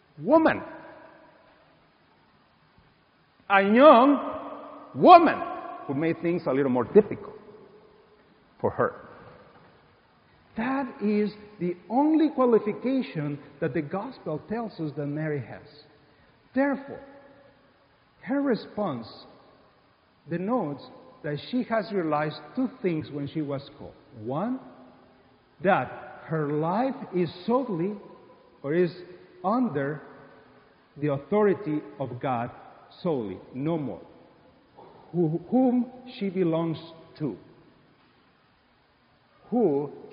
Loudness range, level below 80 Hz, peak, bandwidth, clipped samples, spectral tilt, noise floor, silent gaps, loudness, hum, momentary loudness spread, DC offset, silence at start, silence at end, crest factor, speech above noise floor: 12 LU; -66 dBFS; -2 dBFS; 5.2 kHz; under 0.1%; -5.5 dB/octave; -63 dBFS; none; -26 LUFS; none; 17 LU; under 0.1%; 0.2 s; 0 s; 26 dB; 38 dB